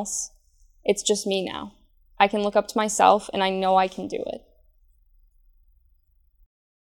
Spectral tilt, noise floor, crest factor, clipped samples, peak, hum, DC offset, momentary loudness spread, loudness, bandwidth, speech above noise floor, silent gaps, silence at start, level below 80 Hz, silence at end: -3 dB/octave; -62 dBFS; 24 dB; under 0.1%; -2 dBFS; none; under 0.1%; 16 LU; -23 LUFS; 17 kHz; 39 dB; none; 0 s; -58 dBFS; 2.5 s